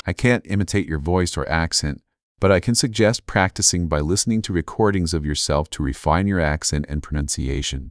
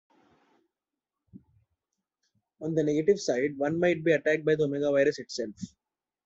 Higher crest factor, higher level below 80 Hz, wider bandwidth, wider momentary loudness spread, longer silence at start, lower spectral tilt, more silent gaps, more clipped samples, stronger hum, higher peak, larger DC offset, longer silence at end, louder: about the same, 18 dB vs 18 dB; first, -32 dBFS vs -68 dBFS; first, 11 kHz vs 8 kHz; second, 7 LU vs 12 LU; second, 0.05 s vs 1.35 s; about the same, -4.5 dB/octave vs -5.5 dB/octave; first, 2.23-2.35 s vs none; neither; neither; first, -2 dBFS vs -12 dBFS; neither; second, 0 s vs 0.6 s; first, -20 LUFS vs -27 LUFS